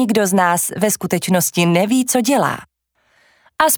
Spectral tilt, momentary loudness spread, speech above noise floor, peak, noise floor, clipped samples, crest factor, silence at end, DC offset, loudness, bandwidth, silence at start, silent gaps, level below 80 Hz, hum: -4 dB/octave; 4 LU; 45 dB; 0 dBFS; -61 dBFS; under 0.1%; 16 dB; 0 s; under 0.1%; -16 LUFS; over 20 kHz; 0 s; none; -58 dBFS; none